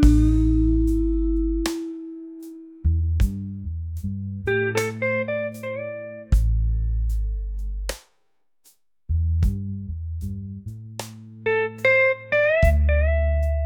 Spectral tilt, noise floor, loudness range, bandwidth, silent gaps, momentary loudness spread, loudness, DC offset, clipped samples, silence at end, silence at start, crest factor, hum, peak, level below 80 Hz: -7 dB/octave; -76 dBFS; 7 LU; 17.5 kHz; none; 17 LU; -23 LUFS; under 0.1%; under 0.1%; 0 s; 0 s; 18 dB; none; -4 dBFS; -26 dBFS